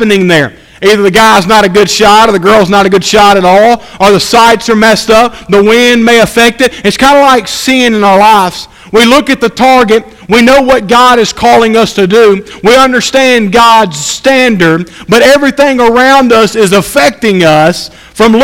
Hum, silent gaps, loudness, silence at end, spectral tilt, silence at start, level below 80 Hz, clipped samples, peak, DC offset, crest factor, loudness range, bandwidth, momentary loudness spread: none; none; -5 LUFS; 0 s; -4 dB/octave; 0 s; -34 dBFS; 7%; 0 dBFS; under 0.1%; 6 dB; 1 LU; 17 kHz; 5 LU